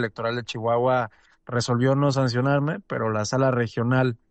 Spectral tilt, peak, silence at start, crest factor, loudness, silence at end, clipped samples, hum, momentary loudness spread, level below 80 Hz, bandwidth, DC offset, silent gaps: -6.5 dB/octave; -10 dBFS; 0 s; 14 dB; -24 LUFS; 0.15 s; under 0.1%; none; 6 LU; -60 dBFS; 8.8 kHz; under 0.1%; none